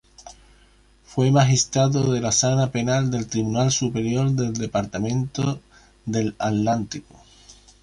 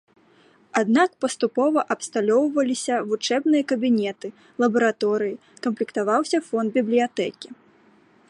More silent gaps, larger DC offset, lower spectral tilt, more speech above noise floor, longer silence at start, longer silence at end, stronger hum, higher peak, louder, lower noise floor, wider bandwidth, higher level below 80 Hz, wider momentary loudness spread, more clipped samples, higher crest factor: neither; neither; about the same, -5 dB/octave vs -4.5 dB/octave; about the same, 34 dB vs 34 dB; second, 0.2 s vs 0.75 s; second, 0.3 s vs 0.75 s; neither; about the same, -6 dBFS vs -6 dBFS; about the same, -22 LUFS vs -22 LUFS; about the same, -55 dBFS vs -56 dBFS; about the same, 11 kHz vs 11.5 kHz; first, -50 dBFS vs -74 dBFS; about the same, 8 LU vs 9 LU; neither; about the same, 18 dB vs 18 dB